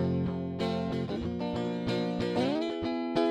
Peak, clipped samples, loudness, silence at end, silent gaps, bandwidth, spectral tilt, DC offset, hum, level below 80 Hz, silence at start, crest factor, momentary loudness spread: -14 dBFS; under 0.1%; -32 LUFS; 0 s; none; 9.6 kHz; -7.5 dB/octave; under 0.1%; none; -54 dBFS; 0 s; 16 dB; 4 LU